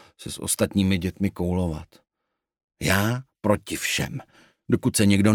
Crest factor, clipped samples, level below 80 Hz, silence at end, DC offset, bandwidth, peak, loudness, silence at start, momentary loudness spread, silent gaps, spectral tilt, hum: 20 dB; under 0.1%; -48 dBFS; 0 s; under 0.1%; 19 kHz; -4 dBFS; -24 LUFS; 0.2 s; 11 LU; 2.64-2.68 s; -5 dB/octave; none